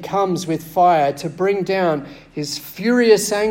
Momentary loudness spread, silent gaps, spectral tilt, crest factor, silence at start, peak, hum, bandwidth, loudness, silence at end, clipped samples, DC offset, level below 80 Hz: 12 LU; none; -4.5 dB/octave; 16 dB; 0 s; -2 dBFS; none; 16.5 kHz; -18 LUFS; 0 s; under 0.1%; under 0.1%; -56 dBFS